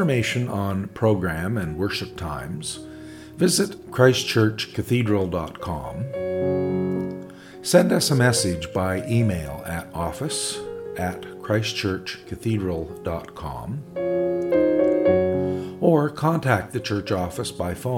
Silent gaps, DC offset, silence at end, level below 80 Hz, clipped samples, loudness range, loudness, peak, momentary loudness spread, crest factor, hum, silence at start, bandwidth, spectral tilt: none; under 0.1%; 0 s; -50 dBFS; under 0.1%; 5 LU; -23 LUFS; -2 dBFS; 13 LU; 20 dB; none; 0 s; 17.5 kHz; -5 dB/octave